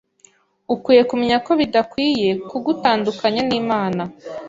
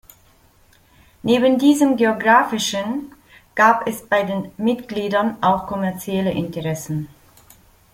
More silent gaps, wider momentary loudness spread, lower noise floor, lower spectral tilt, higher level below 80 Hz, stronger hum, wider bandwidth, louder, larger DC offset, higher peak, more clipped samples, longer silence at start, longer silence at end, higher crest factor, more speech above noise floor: neither; second, 9 LU vs 12 LU; about the same, -54 dBFS vs -54 dBFS; about the same, -6 dB/octave vs -5 dB/octave; about the same, -56 dBFS vs -54 dBFS; neither; second, 7.8 kHz vs 16.5 kHz; about the same, -18 LUFS vs -19 LUFS; neither; about the same, -2 dBFS vs -2 dBFS; neither; second, 0.7 s vs 1.25 s; second, 0 s vs 0.85 s; about the same, 18 dB vs 18 dB; about the same, 36 dB vs 36 dB